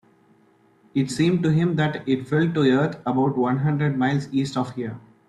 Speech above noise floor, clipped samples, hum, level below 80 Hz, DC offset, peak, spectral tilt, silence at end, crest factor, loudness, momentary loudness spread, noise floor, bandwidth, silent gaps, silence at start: 37 dB; under 0.1%; none; -58 dBFS; under 0.1%; -8 dBFS; -7 dB/octave; 0.3 s; 14 dB; -22 LUFS; 8 LU; -58 dBFS; 11.5 kHz; none; 0.95 s